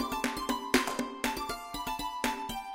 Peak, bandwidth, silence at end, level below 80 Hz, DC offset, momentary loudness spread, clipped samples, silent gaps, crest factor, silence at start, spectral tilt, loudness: -10 dBFS; 17 kHz; 0 s; -52 dBFS; under 0.1%; 8 LU; under 0.1%; none; 24 dB; 0 s; -2.5 dB/octave; -33 LUFS